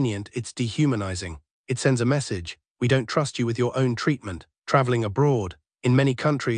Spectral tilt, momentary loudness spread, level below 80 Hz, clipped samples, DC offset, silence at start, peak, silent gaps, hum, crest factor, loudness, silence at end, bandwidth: -6 dB/octave; 12 LU; -56 dBFS; under 0.1%; under 0.1%; 0 s; -4 dBFS; 1.51-1.64 s, 2.70-2.75 s; none; 20 dB; -24 LUFS; 0 s; 10 kHz